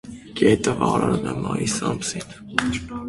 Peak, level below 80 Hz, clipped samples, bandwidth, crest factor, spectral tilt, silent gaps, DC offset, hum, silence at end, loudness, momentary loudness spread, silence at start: 0 dBFS; -46 dBFS; under 0.1%; 11.5 kHz; 22 dB; -5 dB/octave; none; under 0.1%; none; 0 s; -22 LUFS; 9 LU; 0.05 s